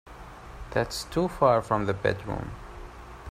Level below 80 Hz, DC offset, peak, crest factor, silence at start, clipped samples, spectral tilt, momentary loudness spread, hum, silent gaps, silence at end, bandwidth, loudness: -46 dBFS; under 0.1%; -8 dBFS; 22 dB; 0.05 s; under 0.1%; -5.5 dB/octave; 22 LU; none; none; 0 s; 16 kHz; -27 LUFS